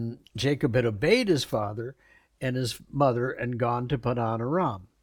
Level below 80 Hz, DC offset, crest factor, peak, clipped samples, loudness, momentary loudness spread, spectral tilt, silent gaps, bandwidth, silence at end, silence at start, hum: -54 dBFS; under 0.1%; 18 dB; -10 dBFS; under 0.1%; -27 LUFS; 10 LU; -6 dB/octave; none; 18 kHz; 0.2 s; 0 s; none